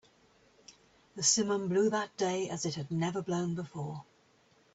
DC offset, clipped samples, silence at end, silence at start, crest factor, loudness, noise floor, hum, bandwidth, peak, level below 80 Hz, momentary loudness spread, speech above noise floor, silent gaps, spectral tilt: under 0.1%; under 0.1%; 0.7 s; 0.7 s; 20 dB; -32 LUFS; -66 dBFS; none; 8.4 kHz; -14 dBFS; -72 dBFS; 14 LU; 34 dB; none; -4 dB/octave